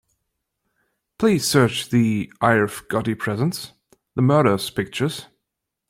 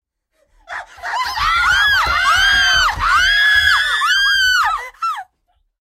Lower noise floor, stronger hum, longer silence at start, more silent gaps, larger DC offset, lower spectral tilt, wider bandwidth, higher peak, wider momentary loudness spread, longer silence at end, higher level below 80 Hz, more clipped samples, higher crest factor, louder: first, -81 dBFS vs -64 dBFS; neither; first, 1.2 s vs 0.7 s; neither; neither; first, -5.5 dB/octave vs 0.5 dB/octave; about the same, 16.5 kHz vs 16 kHz; about the same, -2 dBFS vs -2 dBFS; second, 9 LU vs 14 LU; about the same, 0.65 s vs 0.6 s; second, -56 dBFS vs -36 dBFS; neither; first, 20 dB vs 14 dB; second, -20 LUFS vs -13 LUFS